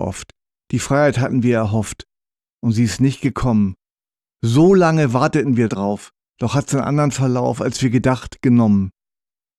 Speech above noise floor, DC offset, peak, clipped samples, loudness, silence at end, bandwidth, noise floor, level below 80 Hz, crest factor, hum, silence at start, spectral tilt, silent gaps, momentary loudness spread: over 74 dB; under 0.1%; -4 dBFS; under 0.1%; -17 LUFS; 0.7 s; 13 kHz; under -90 dBFS; -44 dBFS; 14 dB; none; 0 s; -6.5 dB/octave; 2.53-2.58 s; 11 LU